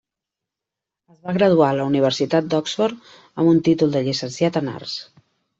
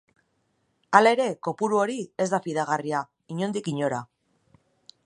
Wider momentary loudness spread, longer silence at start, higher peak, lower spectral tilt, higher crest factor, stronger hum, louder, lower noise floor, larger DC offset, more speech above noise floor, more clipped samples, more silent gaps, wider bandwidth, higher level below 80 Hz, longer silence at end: about the same, 14 LU vs 12 LU; first, 1.25 s vs 0.9 s; about the same, -4 dBFS vs -2 dBFS; about the same, -6 dB/octave vs -5 dB/octave; second, 18 dB vs 24 dB; neither; first, -19 LUFS vs -25 LUFS; first, -86 dBFS vs -71 dBFS; neither; first, 66 dB vs 47 dB; neither; neither; second, 7.8 kHz vs 11 kHz; first, -62 dBFS vs -76 dBFS; second, 0.55 s vs 1 s